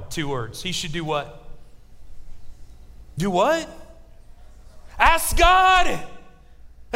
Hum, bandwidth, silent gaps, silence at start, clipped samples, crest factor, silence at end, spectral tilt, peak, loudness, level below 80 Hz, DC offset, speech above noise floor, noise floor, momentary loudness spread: none; 16 kHz; none; 0 s; under 0.1%; 22 dB; 0 s; -3.5 dB/octave; 0 dBFS; -20 LUFS; -34 dBFS; under 0.1%; 25 dB; -44 dBFS; 16 LU